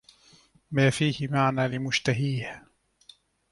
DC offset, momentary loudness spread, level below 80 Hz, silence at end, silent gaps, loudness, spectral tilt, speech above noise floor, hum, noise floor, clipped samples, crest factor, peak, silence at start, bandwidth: under 0.1%; 10 LU; -60 dBFS; 0.9 s; none; -26 LUFS; -5.5 dB/octave; 33 dB; none; -59 dBFS; under 0.1%; 20 dB; -8 dBFS; 0.7 s; 11.5 kHz